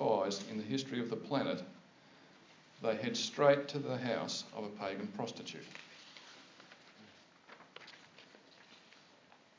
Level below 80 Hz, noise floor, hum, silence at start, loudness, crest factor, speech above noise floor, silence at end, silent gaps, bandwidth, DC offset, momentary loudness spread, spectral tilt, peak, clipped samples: -86 dBFS; -64 dBFS; none; 0 s; -37 LUFS; 24 dB; 27 dB; 0.8 s; none; 7.6 kHz; under 0.1%; 25 LU; -4.5 dB/octave; -14 dBFS; under 0.1%